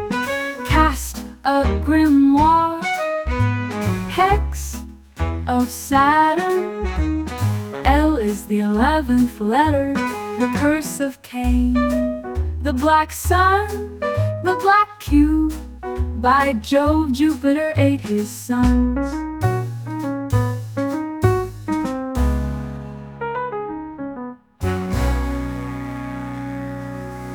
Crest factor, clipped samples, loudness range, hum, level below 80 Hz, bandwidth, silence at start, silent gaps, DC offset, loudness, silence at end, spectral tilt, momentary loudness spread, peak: 18 dB; under 0.1%; 8 LU; none; -30 dBFS; 19.5 kHz; 0 s; none; under 0.1%; -19 LUFS; 0 s; -6 dB/octave; 13 LU; 0 dBFS